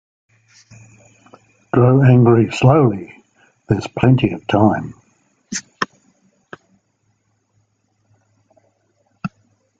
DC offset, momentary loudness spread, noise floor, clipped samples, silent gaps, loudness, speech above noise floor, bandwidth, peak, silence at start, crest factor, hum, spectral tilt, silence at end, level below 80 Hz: under 0.1%; 20 LU; -65 dBFS; under 0.1%; none; -15 LUFS; 51 dB; 7.8 kHz; 0 dBFS; 1.75 s; 18 dB; none; -7.5 dB/octave; 0.5 s; -50 dBFS